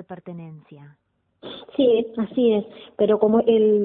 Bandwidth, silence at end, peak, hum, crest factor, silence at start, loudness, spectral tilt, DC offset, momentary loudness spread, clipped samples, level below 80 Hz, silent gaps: 4 kHz; 0 s; -4 dBFS; none; 16 dB; 0.1 s; -20 LUFS; -11.5 dB/octave; under 0.1%; 21 LU; under 0.1%; -62 dBFS; none